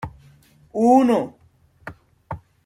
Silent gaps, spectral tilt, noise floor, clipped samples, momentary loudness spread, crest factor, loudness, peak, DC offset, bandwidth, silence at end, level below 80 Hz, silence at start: none; -7 dB/octave; -52 dBFS; under 0.1%; 25 LU; 18 dB; -18 LUFS; -4 dBFS; under 0.1%; 13.5 kHz; 0.3 s; -54 dBFS; 0 s